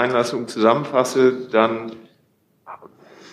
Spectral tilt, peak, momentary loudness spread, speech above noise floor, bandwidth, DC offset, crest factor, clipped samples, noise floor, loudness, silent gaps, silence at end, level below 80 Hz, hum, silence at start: -5 dB/octave; -2 dBFS; 19 LU; 43 dB; 14 kHz; under 0.1%; 20 dB; under 0.1%; -62 dBFS; -19 LUFS; none; 0.45 s; -72 dBFS; none; 0 s